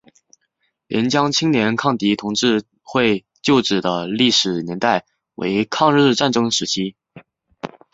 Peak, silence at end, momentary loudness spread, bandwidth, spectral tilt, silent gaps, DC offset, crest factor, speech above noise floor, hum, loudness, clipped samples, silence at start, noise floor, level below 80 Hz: -2 dBFS; 0.25 s; 9 LU; 8 kHz; -4 dB/octave; none; under 0.1%; 18 dB; 52 dB; none; -18 LUFS; under 0.1%; 0.9 s; -70 dBFS; -58 dBFS